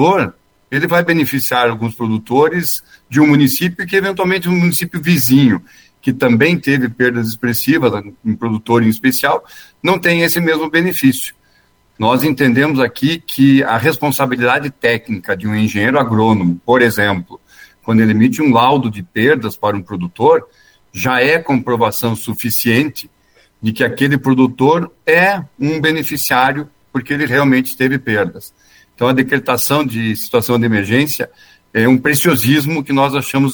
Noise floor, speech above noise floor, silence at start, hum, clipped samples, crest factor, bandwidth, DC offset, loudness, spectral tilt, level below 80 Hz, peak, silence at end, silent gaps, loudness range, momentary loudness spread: -54 dBFS; 40 dB; 0 s; none; under 0.1%; 14 dB; over 20 kHz; under 0.1%; -14 LUFS; -5.5 dB/octave; -52 dBFS; 0 dBFS; 0 s; none; 2 LU; 9 LU